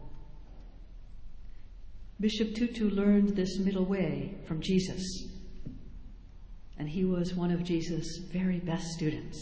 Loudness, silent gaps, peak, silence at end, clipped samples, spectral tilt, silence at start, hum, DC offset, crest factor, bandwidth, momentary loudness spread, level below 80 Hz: -31 LUFS; none; -14 dBFS; 0 s; under 0.1%; -6.5 dB/octave; 0 s; none; under 0.1%; 18 dB; 8 kHz; 22 LU; -48 dBFS